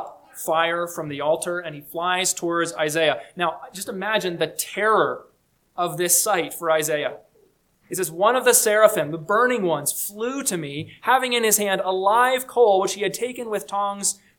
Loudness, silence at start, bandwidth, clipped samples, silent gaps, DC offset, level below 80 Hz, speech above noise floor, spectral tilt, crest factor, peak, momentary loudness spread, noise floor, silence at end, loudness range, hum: -21 LUFS; 0 s; 19 kHz; under 0.1%; none; under 0.1%; -68 dBFS; 39 dB; -2.5 dB/octave; 20 dB; -2 dBFS; 11 LU; -61 dBFS; 0.25 s; 4 LU; none